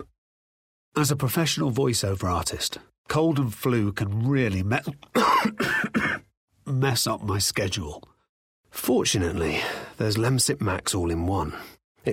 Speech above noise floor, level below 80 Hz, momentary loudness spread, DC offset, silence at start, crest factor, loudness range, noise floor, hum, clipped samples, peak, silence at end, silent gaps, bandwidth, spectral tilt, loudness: over 65 dB; -50 dBFS; 9 LU; under 0.1%; 0 s; 16 dB; 2 LU; under -90 dBFS; none; under 0.1%; -8 dBFS; 0 s; 0.18-0.92 s, 2.98-3.04 s, 6.37-6.48 s, 8.29-8.63 s, 11.84-11.95 s; 16.5 kHz; -4.5 dB/octave; -25 LUFS